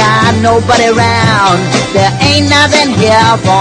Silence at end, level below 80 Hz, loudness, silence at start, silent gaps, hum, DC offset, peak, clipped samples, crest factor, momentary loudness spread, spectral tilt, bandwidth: 0 s; -36 dBFS; -8 LUFS; 0 s; none; none; under 0.1%; 0 dBFS; 0.9%; 8 dB; 3 LU; -4.5 dB/octave; 12 kHz